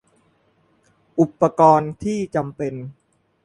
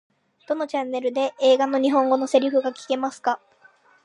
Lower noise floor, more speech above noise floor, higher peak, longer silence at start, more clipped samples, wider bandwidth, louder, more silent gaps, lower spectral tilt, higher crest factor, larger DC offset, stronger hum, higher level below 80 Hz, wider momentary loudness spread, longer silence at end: first, -62 dBFS vs -56 dBFS; first, 43 dB vs 34 dB; about the same, -2 dBFS vs -4 dBFS; first, 1.15 s vs 0.5 s; neither; about the same, 11.5 kHz vs 11 kHz; first, -19 LUFS vs -22 LUFS; neither; first, -8 dB/octave vs -3 dB/octave; about the same, 20 dB vs 18 dB; neither; neither; first, -56 dBFS vs -82 dBFS; first, 14 LU vs 8 LU; second, 0.55 s vs 0.7 s